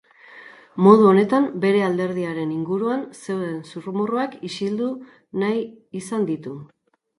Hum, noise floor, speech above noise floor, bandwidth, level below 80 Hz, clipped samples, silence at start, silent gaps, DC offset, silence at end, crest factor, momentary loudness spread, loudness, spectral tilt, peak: none; -45 dBFS; 25 dB; 11.5 kHz; -68 dBFS; under 0.1%; 0.3 s; none; under 0.1%; 0.55 s; 22 dB; 18 LU; -21 LUFS; -7 dB/octave; 0 dBFS